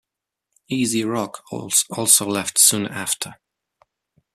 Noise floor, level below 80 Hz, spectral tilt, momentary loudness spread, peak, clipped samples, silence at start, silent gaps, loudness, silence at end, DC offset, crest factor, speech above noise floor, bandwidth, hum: -80 dBFS; -64 dBFS; -2 dB/octave; 14 LU; 0 dBFS; under 0.1%; 0.7 s; none; -18 LUFS; 1 s; under 0.1%; 22 dB; 60 dB; 15 kHz; none